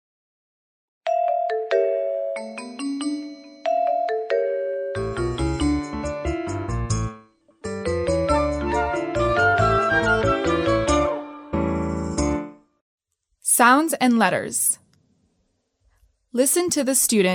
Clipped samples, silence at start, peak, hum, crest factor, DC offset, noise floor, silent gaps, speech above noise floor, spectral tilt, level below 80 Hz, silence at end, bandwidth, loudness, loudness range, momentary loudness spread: under 0.1%; 1.05 s; -4 dBFS; none; 20 dB; under 0.1%; -70 dBFS; 12.81-12.98 s; 51 dB; -4 dB/octave; -38 dBFS; 0 s; 16.5 kHz; -22 LUFS; 5 LU; 12 LU